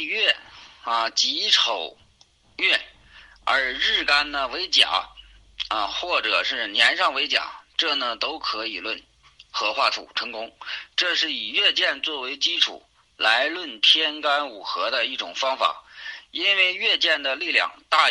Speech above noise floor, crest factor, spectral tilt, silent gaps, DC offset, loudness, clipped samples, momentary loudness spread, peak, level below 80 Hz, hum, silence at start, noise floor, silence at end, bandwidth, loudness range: 35 dB; 22 dB; 0.5 dB/octave; none; under 0.1%; -21 LUFS; under 0.1%; 12 LU; -2 dBFS; -60 dBFS; none; 0 s; -58 dBFS; 0 s; 11.5 kHz; 4 LU